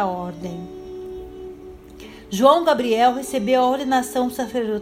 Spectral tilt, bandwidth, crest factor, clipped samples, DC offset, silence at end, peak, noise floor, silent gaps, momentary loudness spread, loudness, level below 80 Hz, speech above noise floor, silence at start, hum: -4.5 dB/octave; 16 kHz; 20 dB; under 0.1%; under 0.1%; 0 s; 0 dBFS; -40 dBFS; none; 23 LU; -19 LUFS; -50 dBFS; 21 dB; 0 s; none